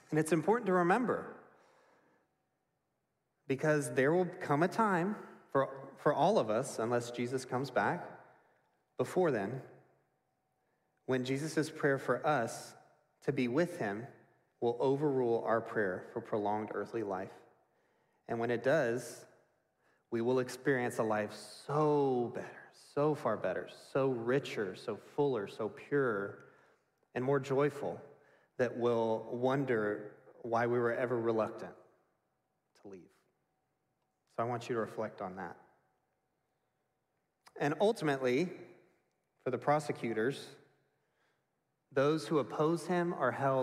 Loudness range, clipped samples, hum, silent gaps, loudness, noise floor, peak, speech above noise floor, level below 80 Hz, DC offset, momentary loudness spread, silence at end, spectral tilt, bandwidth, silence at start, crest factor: 6 LU; under 0.1%; none; none; -34 LUFS; -83 dBFS; -16 dBFS; 50 dB; -80 dBFS; under 0.1%; 14 LU; 0 s; -6 dB/octave; 14.5 kHz; 0.1 s; 20 dB